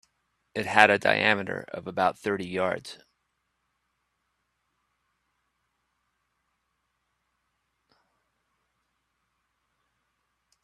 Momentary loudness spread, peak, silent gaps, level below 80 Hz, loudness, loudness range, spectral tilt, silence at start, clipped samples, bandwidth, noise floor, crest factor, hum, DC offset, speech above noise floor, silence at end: 16 LU; 0 dBFS; none; -72 dBFS; -25 LUFS; 12 LU; -4.5 dB/octave; 0.55 s; under 0.1%; 13 kHz; -78 dBFS; 32 dB; 60 Hz at -65 dBFS; under 0.1%; 52 dB; 7.7 s